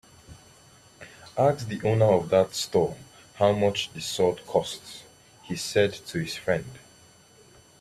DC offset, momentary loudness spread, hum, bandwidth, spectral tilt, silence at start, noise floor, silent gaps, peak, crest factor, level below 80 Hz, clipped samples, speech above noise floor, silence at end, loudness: under 0.1%; 19 LU; none; 15 kHz; -5 dB/octave; 0.3 s; -55 dBFS; none; -8 dBFS; 20 dB; -60 dBFS; under 0.1%; 30 dB; 1.05 s; -26 LUFS